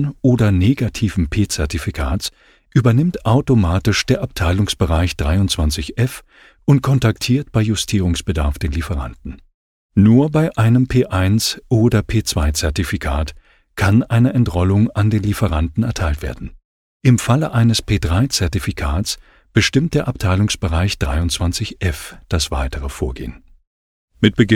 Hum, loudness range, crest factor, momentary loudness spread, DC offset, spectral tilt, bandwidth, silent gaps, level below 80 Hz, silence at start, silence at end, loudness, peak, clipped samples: none; 3 LU; 16 dB; 10 LU; under 0.1%; -5.5 dB/octave; 16 kHz; 9.54-9.89 s, 16.65-17.00 s, 23.67-24.08 s; -30 dBFS; 0 s; 0 s; -17 LUFS; 0 dBFS; under 0.1%